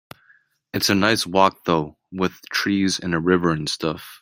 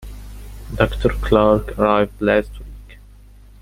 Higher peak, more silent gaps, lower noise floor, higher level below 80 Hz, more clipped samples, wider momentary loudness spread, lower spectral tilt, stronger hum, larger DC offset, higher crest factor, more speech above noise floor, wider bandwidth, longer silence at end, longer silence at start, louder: about the same, -2 dBFS vs 0 dBFS; neither; first, -58 dBFS vs -43 dBFS; second, -56 dBFS vs -30 dBFS; neither; second, 8 LU vs 23 LU; second, -4.5 dB/octave vs -7 dB/octave; second, none vs 50 Hz at -30 dBFS; neither; about the same, 20 dB vs 20 dB; first, 37 dB vs 26 dB; about the same, 16.5 kHz vs 16 kHz; second, 0.05 s vs 0.65 s; first, 0.75 s vs 0 s; second, -21 LUFS vs -18 LUFS